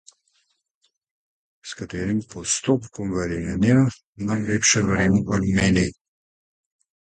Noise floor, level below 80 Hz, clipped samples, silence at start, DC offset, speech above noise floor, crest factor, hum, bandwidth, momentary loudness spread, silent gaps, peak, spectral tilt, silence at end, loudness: -71 dBFS; -44 dBFS; under 0.1%; 1.65 s; under 0.1%; 49 dB; 18 dB; none; 9.4 kHz; 12 LU; 4.05-4.13 s; -6 dBFS; -4.5 dB/octave; 1.15 s; -22 LUFS